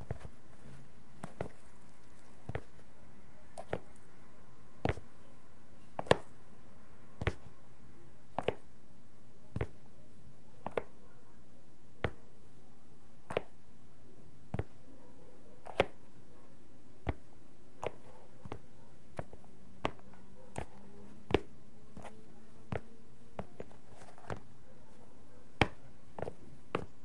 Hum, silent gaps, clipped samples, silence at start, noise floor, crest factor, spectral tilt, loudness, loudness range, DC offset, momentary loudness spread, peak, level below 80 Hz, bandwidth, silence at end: none; none; under 0.1%; 0 s; -62 dBFS; 38 dB; -6 dB/octave; -41 LUFS; 10 LU; 1%; 25 LU; -6 dBFS; -58 dBFS; 11.5 kHz; 0.2 s